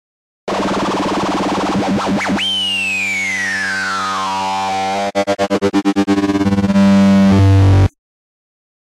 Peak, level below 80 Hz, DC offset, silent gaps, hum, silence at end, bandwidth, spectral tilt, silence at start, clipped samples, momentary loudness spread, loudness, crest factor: -6 dBFS; -38 dBFS; under 0.1%; none; none; 0.95 s; 12.5 kHz; -5.5 dB/octave; 0.45 s; under 0.1%; 8 LU; -15 LUFS; 10 dB